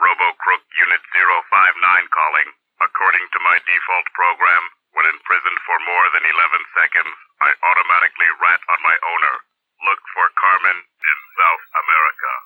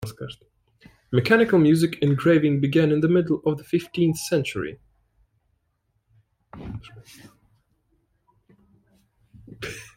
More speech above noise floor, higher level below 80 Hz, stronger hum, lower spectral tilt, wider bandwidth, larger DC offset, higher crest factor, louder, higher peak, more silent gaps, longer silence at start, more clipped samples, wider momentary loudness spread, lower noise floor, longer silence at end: second, 18 dB vs 51 dB; second, -88 dBFS vs -56 dBFS; neither; second, -2 dB/octave vs -6.5 dB/octave; about the same, 16.5 kHz vs 16.5 kHz; neither; about the same, 16 dB vs 20 dB; first, -15 LUFS vs -21 LUFS; first, 0 dBFS vs -4 dBFS; neither; about the same, 0 s vs 0 s; neither; second, 6 LU vs 20 LU; second, -35 dBFS vs -72 dBFS; about the same, 0.05 s vs 0.15 s